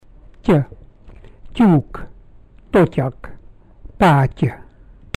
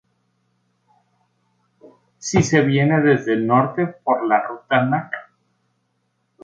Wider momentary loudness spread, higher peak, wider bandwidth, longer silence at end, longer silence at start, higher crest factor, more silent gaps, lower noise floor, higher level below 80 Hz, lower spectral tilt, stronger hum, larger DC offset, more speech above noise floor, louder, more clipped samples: first, 17 LU vs 8 LU; second, -6 dBFS vs -2 dBFS; first, 13.5 kHz vs 9 kHz; second, 0.6 s vs 1.2 s; second, 0.45 s vs 2.2 s; second, 12 dB vs 20 dB; neither; second, -44 dBFS vs -70 dBFS; first, -38 dBFS vs -56 dBFS; first, -8.5 dB/octave vs -6 dB/octave; neither; neither; second, 29 dB vs 52 dB; about the same, -17 LUFS vs -18 LUFS; neither